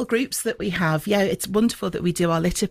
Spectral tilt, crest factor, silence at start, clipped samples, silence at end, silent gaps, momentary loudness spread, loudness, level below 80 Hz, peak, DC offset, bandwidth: -5 dB/octave; 14 dB; 0 s; under 0.1%; 0 s; none; 4 LU; -22 LUFS; -44 dBFS; -8 dBFS; under 0.1%; 16 kHz